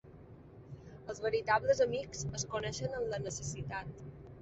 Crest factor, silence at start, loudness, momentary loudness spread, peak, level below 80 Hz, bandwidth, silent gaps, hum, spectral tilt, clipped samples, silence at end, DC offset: 20 dB; 0.05 s; -35 LUFS; 22 LU; -16 dBFS; -58 dBFS; 8.2 kHz; none; none; -4 dB/octave; under 0.1%; 0 s; under 0.1%